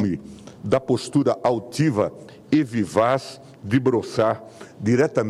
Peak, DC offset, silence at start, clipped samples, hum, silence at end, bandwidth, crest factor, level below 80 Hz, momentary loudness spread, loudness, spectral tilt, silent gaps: -6 dBFS; under 0.1%; 0 s; under 0.1%; none; 0 s; 13 kHz; 16 dB; -58 dBFS; 13 LU; -22 LUFS; -6.5 dB/octave; none